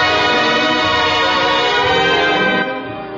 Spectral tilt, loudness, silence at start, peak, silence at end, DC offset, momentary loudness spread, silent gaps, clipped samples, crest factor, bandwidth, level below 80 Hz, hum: -3.5 dB/octave; -13 LUFS; 0 s; -2 dBFS; 0 s; under 0.1%; 4 LU; none; under 0.1%; 12 dB; 7.8 kHz; -44 dBFS; none